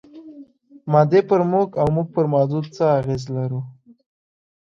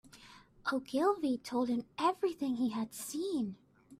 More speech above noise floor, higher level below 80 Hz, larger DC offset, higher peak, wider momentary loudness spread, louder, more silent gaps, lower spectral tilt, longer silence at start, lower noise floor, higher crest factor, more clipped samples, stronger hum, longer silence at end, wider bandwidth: about the same, 26 dB vs 24 dB; first, -54 dBFS vs -72 dBFS; neither; first, -2 dBFS vs -18 dBFS; about the same, 11 LU vs 9 LU; first, -19 LUFS vs -35 LUFS; neither; first, -8.5 dB/octave vs -4.5 dB/octave; about the same, 0.15 s vs 0.15 s; second, -45 dBFS vs -58 dBFS; about the same, 18 dB vs 18 dB; neither; neither; first, 1 s vs 0.05 s; second, 7.4 kHz vs 15.5 kHz